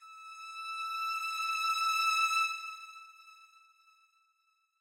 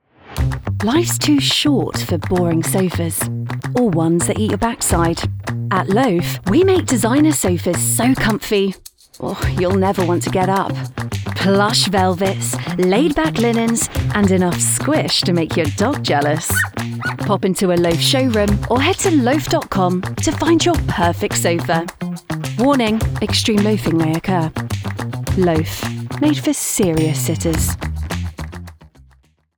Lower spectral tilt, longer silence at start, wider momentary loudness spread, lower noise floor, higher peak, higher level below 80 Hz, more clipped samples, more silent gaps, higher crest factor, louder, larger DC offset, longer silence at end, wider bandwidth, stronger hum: second, 10 dB/octave vs -4.5 dB/octave; second, 0 s vs 0.25 s; first, 21 LU vs 10 LU; first, -76 dBFS vs -54 dBFS; second, -20 dBFS vs -2 dBFS; second, under -90 dBFS vs -34 dBFS; neither; neither; about the same, 16 dB vs 16 dB; second, -31 LUFS vs -17 LUFS; neither; first, 1.35 s vs 0.7 s; second, 16 kHz vs over 20 kHz; neither